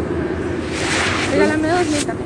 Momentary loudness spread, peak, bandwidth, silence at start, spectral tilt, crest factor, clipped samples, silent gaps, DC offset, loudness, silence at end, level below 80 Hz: 6 LU; -2 dBFS; 11.5 kHz; 0 s; -4.5 dB/octave; 16 dB; under 0.1%; none; under 0.1%; -18 LUFS; 0 s; -40 dBFS